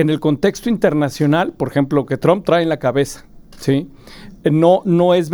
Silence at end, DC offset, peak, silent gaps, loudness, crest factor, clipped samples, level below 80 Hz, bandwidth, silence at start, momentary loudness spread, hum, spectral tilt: 0 s; under 0.1%; 0 dBFS; none; -16 LUFS; 16 dB; under 0.1%; -46 dBFS; over 20 kHz; 0 s; 8 LU; none; -7 dB/octave